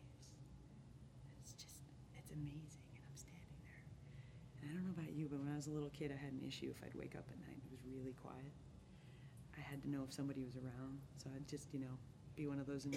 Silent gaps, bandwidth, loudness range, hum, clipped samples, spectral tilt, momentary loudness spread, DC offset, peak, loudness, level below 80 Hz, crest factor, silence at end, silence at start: none; 16 kHz; 8 LU; none; under 0.1%; -6 dB/octave; 14 LU; under 0.1%; -32 dBFS; -52 LUFS; -68 dBFS; 18 dB; 0 s; 0 s